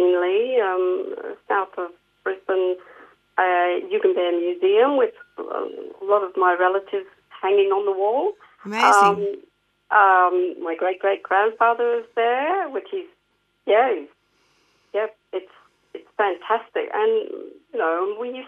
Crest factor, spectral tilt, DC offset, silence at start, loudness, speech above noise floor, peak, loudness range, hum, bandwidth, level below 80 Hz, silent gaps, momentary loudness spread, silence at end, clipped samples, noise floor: 18 dB; -4 dB/octave; under 0.1%; 0 s; -21 LUFS; 48 dB; -2 dBFS; 7 LU; 50 Hz at -75 dBFS; 12 kHz; -76 dBFS; none; 15 LU; 0 s; under 0.1%; -68 dBFS